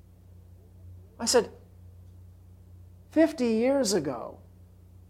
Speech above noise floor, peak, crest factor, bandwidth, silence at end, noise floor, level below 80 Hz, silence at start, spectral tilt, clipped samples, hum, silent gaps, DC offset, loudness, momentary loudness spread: 27 dB; -10 dBFS; 20 dB; 16.5 kHz; 0.75 s; -52 dBFS; -60 dBFS; 0.85 s; -4 dB/octave; under 0.1%; none; none; under 0.1%; -26 LUFS; 14 LU